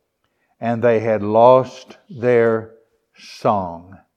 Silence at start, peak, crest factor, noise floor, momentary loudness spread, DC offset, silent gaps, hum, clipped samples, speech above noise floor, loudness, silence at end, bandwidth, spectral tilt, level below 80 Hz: 0.6 s; 0 dBFS; 18 dB; -68 dBFS; 16 LU; under 0.1%; none; none; under 0.1%; 51 dB; -17 LUFS; 0.2 s; 8.2 kHz; -7.5 dB/octave; -64 dBFS